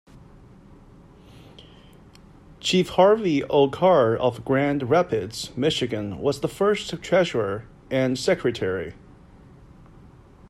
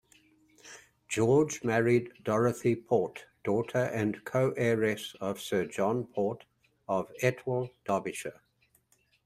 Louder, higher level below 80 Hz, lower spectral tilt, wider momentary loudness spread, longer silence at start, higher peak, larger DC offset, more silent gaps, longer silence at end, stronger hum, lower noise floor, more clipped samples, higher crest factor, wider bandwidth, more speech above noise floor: first, -22 LUFS vs -30 LUFS; first, -52 dBFS vs -68 dBFS; about the same, -5.5 dB/octave vs -6 dB/octave; about the same, 10 LU vs 12 LU; second, 0.15 s vs 0.65 s; first, -6 dBFS vs -10 dBFS; neither; neither; first, 1.6 s vs 0.95 s; neither; second, -49 dBFS vs -70 dBFS; neither; about the same, 18 dB vs 20 dB; second, 14 kHz vs 15.5 kHz; second, 27 dB vs 41 dB